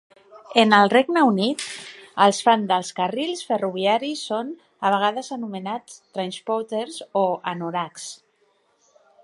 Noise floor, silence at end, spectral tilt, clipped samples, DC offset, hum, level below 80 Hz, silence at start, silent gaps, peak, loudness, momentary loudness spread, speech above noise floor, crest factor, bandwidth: -65 dBFS; 1.1 s; -4 dB/octave; under 0.1%; under 0.1%; none; -76 dBFS; 0.35 s; none; 0 dBFS; -22 LUFS; 16 LU; 43 dB; 22 dB; 11.5 kHz